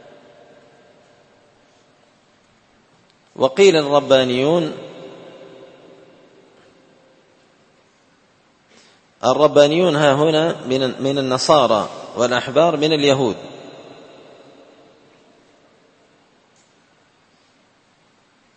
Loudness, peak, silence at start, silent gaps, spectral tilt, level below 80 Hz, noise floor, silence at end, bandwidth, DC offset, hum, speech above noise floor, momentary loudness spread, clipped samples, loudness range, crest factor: -16 LUFS; 0 dBFS; 3.35 s; none; -5 dB/octave; -62 dBFS; -57 dBFS; 4.75 s; 8.8 kHz; under 0.1%; none; 42 dB; 24 LU; under 0.1%; 9 LU; 20 dB